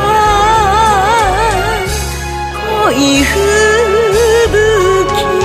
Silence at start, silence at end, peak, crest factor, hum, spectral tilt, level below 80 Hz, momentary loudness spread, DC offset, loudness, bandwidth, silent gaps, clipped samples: 0 s; 0 s; 0 dBFS; 10 dB; none; -4 dB/octave; -24 dBFS; 8 LU; under 0.1%; -10 LUFS; 16 kHz; none; under 0.1%